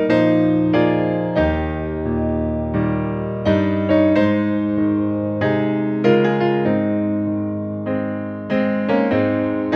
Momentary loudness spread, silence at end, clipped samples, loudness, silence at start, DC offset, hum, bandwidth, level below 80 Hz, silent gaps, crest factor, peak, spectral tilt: 8 LU; 0 s; under 0.1%; -19 LUFS; 0 s; under 0.1%; none; 6.2 kHz; -38 dBFS; none; 16 dB; -2 dBFS; -9 dB/octave